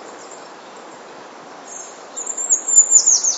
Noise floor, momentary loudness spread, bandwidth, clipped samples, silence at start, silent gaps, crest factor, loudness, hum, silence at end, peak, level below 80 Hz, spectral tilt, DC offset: -38 dBFS; 26 LU; 8.2 kHz; under 0.1%; 0 s; none; 20 dB; -12 LUFS; none; 0 s; 0 dBFS; -80 dBFS; 2.5 dB/octave; under 0.1%